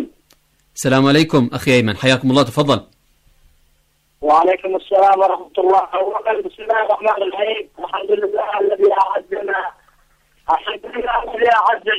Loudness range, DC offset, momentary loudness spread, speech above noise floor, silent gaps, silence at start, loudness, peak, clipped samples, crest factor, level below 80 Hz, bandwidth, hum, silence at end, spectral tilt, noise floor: 3 LU; under 0.1%; 10 LU; 44 dB; none; 0 s; -16 LUFS; -4 dBFS; under 0.1%; 14 dB; -50 dBFS; 15 kHz; none; 0 s; -5.5 dB/octave; -60 dBFS